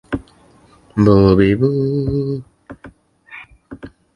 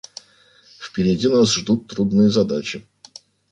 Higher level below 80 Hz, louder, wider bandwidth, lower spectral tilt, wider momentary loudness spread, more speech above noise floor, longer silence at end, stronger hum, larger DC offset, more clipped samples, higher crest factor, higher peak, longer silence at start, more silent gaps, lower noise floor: first, -38 dBFS vs -52 dBFS; first, -16 LUFS vs -19 LUFS; about the same, 10 kHz vs 9.6 kHz; first, -9.5 dB/octave vs -5.5 dB/octave; first, 25 LU vs 20 LU; about the same, 36 dB vs 35 dB; second, 0.3 s vs 0.7 s; neither; neither; neither; about the same, 18 dB vs 16 dB; first, 0 dBFS vs -4 dBFS; second, 0.1 s vs 0.8 s; neither; second, -49 dBFS vs -53 dBFS